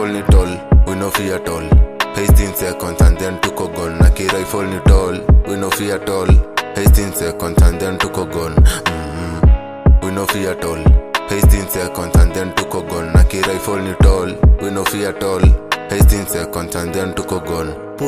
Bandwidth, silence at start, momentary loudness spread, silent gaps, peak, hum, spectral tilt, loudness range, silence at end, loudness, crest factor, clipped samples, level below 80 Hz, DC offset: 15.5 kHz; 0 s; 7 LU; none; 0 dBFS; none; -5.5 dB/octave; 1 LU; 0 s; -15 LUFS; 12 dB; under 0.1%; -16 dBFS; under 0.1%